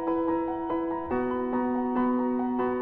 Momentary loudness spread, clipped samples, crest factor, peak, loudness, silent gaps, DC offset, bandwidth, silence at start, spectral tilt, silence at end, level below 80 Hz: 4 LU; under 0.1%; 12 dB; -16 dBFS; -28 LUFS; none; under 0.1%; 3.9 kHz; 0 s; -10 dB/octave; 0 s; -56 dBFS